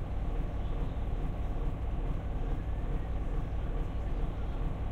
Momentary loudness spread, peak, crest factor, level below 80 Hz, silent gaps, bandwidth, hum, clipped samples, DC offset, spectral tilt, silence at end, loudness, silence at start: 1 LU; -22 dBFS; 10 dB; -34 dBFS; none; 4.3 kHz; none; under 0.1%; under 0.1%; -8.5 dB/octave; 0 s; -38 LUFS; 0 s